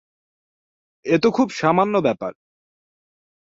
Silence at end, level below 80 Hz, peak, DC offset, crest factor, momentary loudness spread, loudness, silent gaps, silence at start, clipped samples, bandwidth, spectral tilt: 1.2 s; -62 dBFS; -4 dBFS; under 0.1%; 20 dB; 13 LU; -19 LUFS; none; 1.05 s; under 0.1%; 7.8 kHz; -6.5 dB/octave